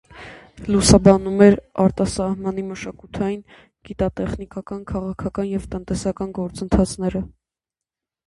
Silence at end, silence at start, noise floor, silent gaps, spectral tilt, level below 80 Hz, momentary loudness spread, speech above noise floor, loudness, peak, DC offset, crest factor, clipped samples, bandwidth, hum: 1 s; 0.15 s; -88 dBFS; none; -6 dB/octave; -36 dBFS; 19 LU; 68 dB; -20 LUFS; 0 dBFS; under 0.1%; 20 dB; under 0.1%; 11.5 kHz; none